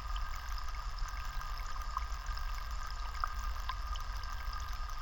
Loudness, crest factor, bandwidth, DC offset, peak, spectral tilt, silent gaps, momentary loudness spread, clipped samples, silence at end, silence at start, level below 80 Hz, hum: -42 LUFS; 18 dB; 17.5 kHz; under 0.1%; -18 dBFS; -3 dB/octave; none; 3 LU; under 0.1%; 0 s; 0 s; -40 dBFS; none